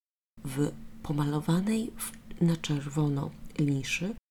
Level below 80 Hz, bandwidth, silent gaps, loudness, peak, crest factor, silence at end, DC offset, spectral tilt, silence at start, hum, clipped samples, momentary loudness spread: -52 dBFS; 19 kHz; none; -31 LUFS; -16 dBFS; 16 dB; 0.15 s; under 0.1%; -6 dB/octave; 0.35 s; none; under 0.1%; 10 LU